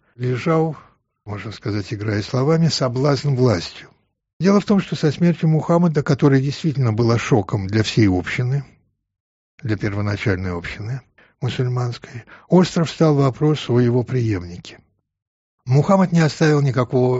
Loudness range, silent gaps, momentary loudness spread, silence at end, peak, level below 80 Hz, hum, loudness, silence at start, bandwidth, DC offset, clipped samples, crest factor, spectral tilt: 6 LU; 4.33-4.40 s, 9.20-9.58 s, 15.27-15.58 s; 13 LU; 0 s; -4 dBFS; -50 dBFS; none; -19 LUFS; 0.2 s; 8 kHz; under 0.1%; under 0.1%; 16 dB; -6.5 dB/octave